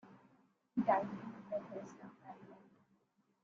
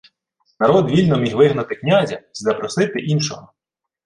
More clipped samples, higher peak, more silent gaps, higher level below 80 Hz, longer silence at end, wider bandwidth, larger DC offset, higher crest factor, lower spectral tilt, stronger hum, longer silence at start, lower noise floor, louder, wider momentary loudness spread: neither; second, -20 dBFS vs -2 dBFS; neither; second, -82 dBFS vs -54 dBFS; first, 0.8 s vs 0.65 s; second, 7.4 kHz vs 11 kHz; neither; first, 24 dB vs 16 dB; about the same, -6.5 dB/octave vs -6 dB/octave; neither; second, 0.05 s vs 0.6 s; first, -78 dBFS vs -67 dBFS; second, -40 LUFS vs -18 LUFS; first, 21 LU vs 9 LU